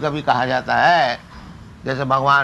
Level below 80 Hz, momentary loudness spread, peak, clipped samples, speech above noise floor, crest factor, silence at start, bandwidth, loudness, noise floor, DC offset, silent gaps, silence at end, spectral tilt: -48 dBFS; 13 LU; -2 dBFS; under 0.1%; 21 dB; 16 dB; 0 s; 11.5 kHz; -18 LUFS; -38 dBFS; under 0.1%; none; 0 s; -5.5 dB/octave